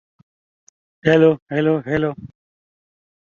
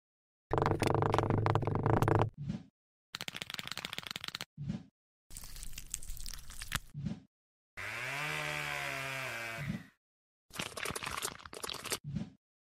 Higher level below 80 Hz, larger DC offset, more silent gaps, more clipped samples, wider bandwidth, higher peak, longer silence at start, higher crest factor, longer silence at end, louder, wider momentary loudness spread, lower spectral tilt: about the same, -56 dBFS vs -52 dBFS; neither; second, 1.42-1.46 s vs 2.70-3.13 s, 4.46-4.57 s, 4.91-5.30 s, 7.27-7.77 s, 9.97-10.49 s, 12.00-12.04 s; neither; second, 7 kHz vs 16 kHz; first, -2 dBFS vs -14 dBFS; first, 1.05 s vs 0.5 s; about the same, 20 dB vs 24 dB; first, 1.05 s vs 0.4 s; first, -18 LUFS vs -37 LUFS; second, 10 LU vs 15 LU; first, -8 dB/octave vs -4.5 dB/octave